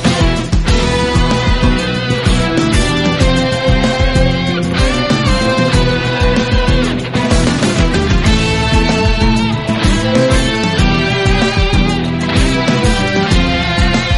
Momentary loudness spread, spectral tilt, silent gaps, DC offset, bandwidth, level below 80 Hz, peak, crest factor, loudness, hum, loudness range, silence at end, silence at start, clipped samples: 2 LU; -5.5 dB/octave; none; under 0.1%; 11.5 kHz; -18 dBFS; 0 dBFS; 12 dB; -13 LUFS; none; 1 LU; 0 s; 0 s; under 0.1%